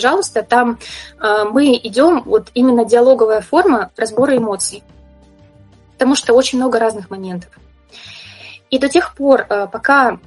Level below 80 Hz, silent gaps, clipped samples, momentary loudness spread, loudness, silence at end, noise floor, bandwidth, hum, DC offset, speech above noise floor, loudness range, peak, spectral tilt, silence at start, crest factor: -50 dBFS; none; under 0.1%; 16 LU; -14 LUFS; 0.1 s; -46 dBFS; 11.5 kHz; none; under 0.1%; 32 dB; 5 LU; 0 dBFS; -3.5 dB/octave; 0 s; 14 dB